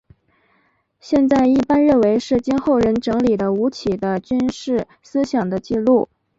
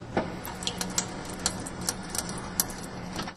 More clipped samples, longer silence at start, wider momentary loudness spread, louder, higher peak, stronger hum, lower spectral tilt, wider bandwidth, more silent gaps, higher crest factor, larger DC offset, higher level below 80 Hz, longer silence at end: neither; first, 1.05 s vs 0 s; about the same, 8 LU vs 7 LU; first, -18 LUFS vs -32 LUFS; second, -4 dBFS vs 0 dBFS; neither; first, -7 dB/octave vs -2.5 dB/octave; second, 7.8 kHz vs 14 kHz; neither; second, 14 dB vs 34 dB; neither; about the same, -48 dBFS vs -48 dBFS; first, 0.35 s vs 0 s